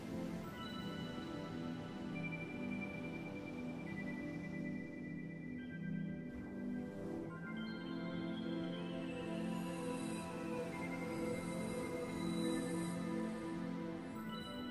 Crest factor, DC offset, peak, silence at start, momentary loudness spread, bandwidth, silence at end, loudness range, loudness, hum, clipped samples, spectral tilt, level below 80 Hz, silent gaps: 16 dB; under 0.1%; -28 dBFS; 0 s; 5 LU; 15 kHz; 0 s; 4 LU; -44 LUFS; none; under 0.1%; -6 dB/octave; -66 dBFS; none